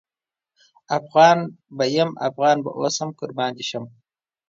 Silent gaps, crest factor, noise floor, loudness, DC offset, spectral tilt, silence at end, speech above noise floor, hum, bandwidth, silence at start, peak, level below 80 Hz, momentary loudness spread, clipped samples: none; 20 dB; under -90 dBFS; -21 LUFS; under 0.1%; -4.5 dB/octave; 0.6 s; over 70 dB; none; 7.8 kHz; 0.9 s; -2 dBFS; -72 dBFS; 14 LU; under 0.1%